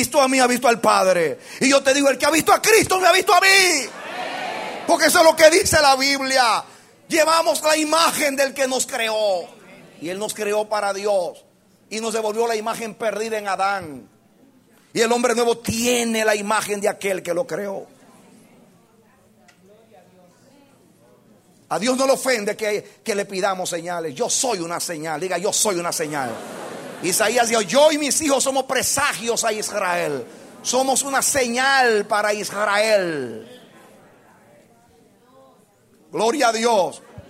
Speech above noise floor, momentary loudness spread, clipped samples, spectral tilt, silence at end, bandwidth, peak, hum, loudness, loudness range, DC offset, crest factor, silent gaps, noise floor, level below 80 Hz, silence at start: 36 dB; 13 LU; under 0.1%; -2 dB/octave; 0.1 s; 16 kHz; 0 dBFS; none; -19 LUFS; 9 LU; under 0.1%; 20 dB; none; -55 dBFS; -56 dBFS; 0 s